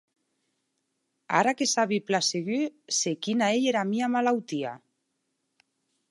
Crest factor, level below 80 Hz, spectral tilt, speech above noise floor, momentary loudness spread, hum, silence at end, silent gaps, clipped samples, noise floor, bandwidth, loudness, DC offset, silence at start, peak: 22 dB; -82 dBFS; -3 dB/octave; 52 dB; 6 LU; none; 1.35 s; none; under 0.1%; -78 dBFS; 11.5 kHz; -26 LUFS; under 0.1%; 1.3 s; -6 dBFS